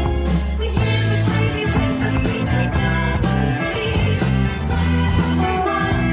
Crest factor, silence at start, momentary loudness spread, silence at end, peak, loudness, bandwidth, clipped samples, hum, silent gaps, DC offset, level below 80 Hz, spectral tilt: 14 dB; 0 s; 2 LU; 0 s; -4 dBFS; -19 LUFS; 4 kHz; under 0.1%; none; none; under 0.1%; -24 dBFS; -11 dB/octave